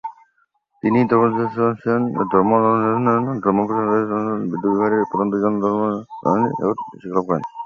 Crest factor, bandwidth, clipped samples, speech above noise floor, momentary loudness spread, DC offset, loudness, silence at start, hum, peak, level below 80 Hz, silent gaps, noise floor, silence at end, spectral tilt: 16 dB; 6.8 kHz; under 0.1%; 46 dB; 8 LU; under 0.1%; -19 LUFS; 0.05 s; none; -2 dBFS; -58 dBFS; none; -65 dBFS; 0 s; -10 dB/octave